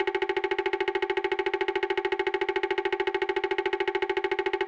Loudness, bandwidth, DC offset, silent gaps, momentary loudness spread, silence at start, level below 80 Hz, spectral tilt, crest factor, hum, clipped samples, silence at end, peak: -28 LUFS; 8 kHz; under 0.1%; none; 1 LU; 0 s; -60 dBFS; -4 dB/octave; 14 dB; none; under 0.1%; 0 s; -14 dBFS